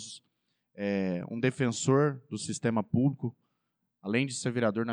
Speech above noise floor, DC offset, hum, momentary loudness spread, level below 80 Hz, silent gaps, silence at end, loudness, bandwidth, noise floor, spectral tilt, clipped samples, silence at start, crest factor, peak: 52 dB; under 0.1%; none; 12 LU; -74 dBFS; none; 0 s; -30 LUFS; 10.5 kHz; -81 dBFS; -5.5 dB/octave; under 0.1%; 0 s; 16 dB; -14 dBFS